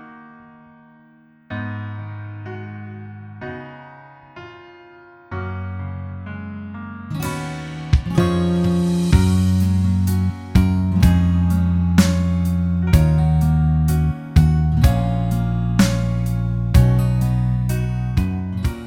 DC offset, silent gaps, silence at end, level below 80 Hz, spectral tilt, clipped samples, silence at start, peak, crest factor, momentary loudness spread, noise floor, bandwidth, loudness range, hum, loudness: under 0.1%; none; 0 s; -26 dBFS; -7 dB/octave; under 0.1%; 0 s; 0 dBFS; 18 dB; 17 LU; -51 dBFS; 17 kHz; 16 LU; none; -19 LUFS